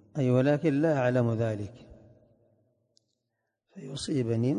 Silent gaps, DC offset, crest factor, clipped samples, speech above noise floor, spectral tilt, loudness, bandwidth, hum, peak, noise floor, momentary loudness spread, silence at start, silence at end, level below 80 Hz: none; under 0.1%; 16 dB; under 0.1%; 56 dB; -7.5 dB/octave; -27 LUFS; 10 kHz; none; -14 dBFS; -82 dBFS; 15 LU; 0.15 s; 0 s; -62 dBFS